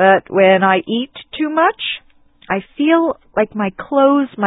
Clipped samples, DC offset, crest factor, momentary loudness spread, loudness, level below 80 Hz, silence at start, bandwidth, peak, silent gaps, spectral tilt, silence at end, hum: under 0.1%; under 0.1%; 16 dB; 11 LU; -16 LUFS; -56 dBFS; 0 s; 4 kHz; 0 dBFS; none; -11 dB/octave; 0 s; none